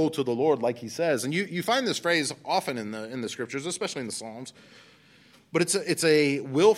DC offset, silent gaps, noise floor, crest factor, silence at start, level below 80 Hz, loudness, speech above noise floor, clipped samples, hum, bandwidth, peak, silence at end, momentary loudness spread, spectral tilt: under 0.1%; none; -57 dBFS; 20 dB; 0 s; -76 dBFS; -27 LUFS; 31 dB; under 0.1%; none; 16 kHz; -8 dBFS; 0 s; 12 LU; -4 dB/octave